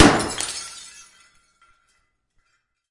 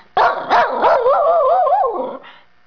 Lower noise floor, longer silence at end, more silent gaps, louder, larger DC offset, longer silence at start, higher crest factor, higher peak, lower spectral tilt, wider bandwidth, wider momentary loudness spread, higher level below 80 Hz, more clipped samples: first, -71 dBFS vs -43 dBFS; first, 2.1 s vs 0.35 s; neither; second, -22 LUFS vs -15 LUFS; second, under 0.1% vs 0.4%; second, 0 s vs 0.15 s; first, 22 dB vs 10 dB; about the same, -2 dBFS vs -4 dBFS; about the same, -3.5 dB/octave vs -4.5 dB/octave; first, 11.5 kHz vs 5.4 kHz; first, 24 LU vs 11 LU; first, -46 dBFS vs -52 dBFS; neither